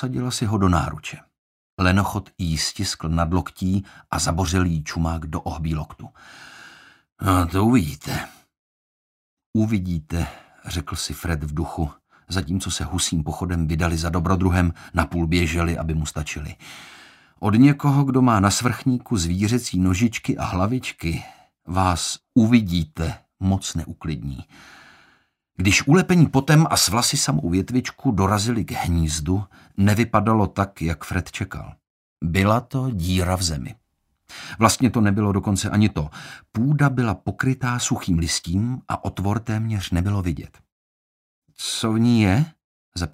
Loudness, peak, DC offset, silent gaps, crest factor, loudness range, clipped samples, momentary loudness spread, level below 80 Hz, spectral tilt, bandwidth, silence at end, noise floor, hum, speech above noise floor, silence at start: -22 LUFS; -2 dBFS; under 0.1%; 1.38-1.77 s, 7.12-7.16 s, 8.59-9.37 s, 9.46-9.53 s, 31.90-32.16 s, 40.72-41.42 s, 42.64-42.92 s; 20 dB; 7 LU; under 0.1%; 13 LU; -38 dBFS; -5 dB/octave; 16 kHz; 0.05 s; -62 dBFS; none; 41 dB; 0 s